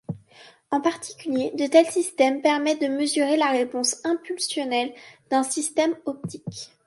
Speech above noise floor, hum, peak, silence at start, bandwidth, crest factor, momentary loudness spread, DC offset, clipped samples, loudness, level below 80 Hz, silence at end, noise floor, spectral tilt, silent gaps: 28 dB; none; -4 dBFS; 0.1 s; 11.5 kHz; 20 dB; 14 LU; under 0.1%; under 0.1%; -23 LUFS; -70 dBFS; 0.2 s; -52 dBFS; -3.5 dB/octave; none